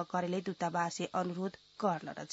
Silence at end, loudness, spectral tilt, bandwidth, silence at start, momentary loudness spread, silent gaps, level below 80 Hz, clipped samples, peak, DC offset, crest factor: 0 s; -36 LUFS; -5 dB/octave; 7.6 kHz; 0 s; 5 LU; none; -78 dBFS; under 0.1%; -18 dBFS; under 0.1%; 18 dB